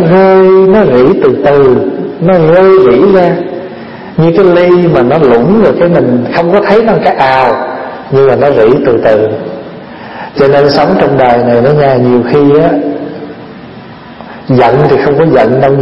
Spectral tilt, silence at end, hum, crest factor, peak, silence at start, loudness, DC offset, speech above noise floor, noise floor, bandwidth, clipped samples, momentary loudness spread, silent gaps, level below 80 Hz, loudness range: -9 dB/octave; 0 s; none; 6 dB; 0 dBFS; 0 s; -6 LUFS; under 0.1%; 22 dB; -28 dBFS; 5.8 kHz; 2%; 17 LU; none; -38 dBFS; 3 LU